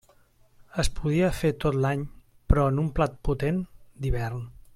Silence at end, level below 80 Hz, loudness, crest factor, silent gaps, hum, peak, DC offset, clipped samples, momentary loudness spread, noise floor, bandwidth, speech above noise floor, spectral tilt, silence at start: 0.25 s; -34 dBFS; -27 LUFS; 22 dB; none; none; -4 dBFS; under 0.1%; under 0.1%; 11 LU; -59 dBFS; 15.5 kHz; 34 dB; -7 dB/octave; 0.75 s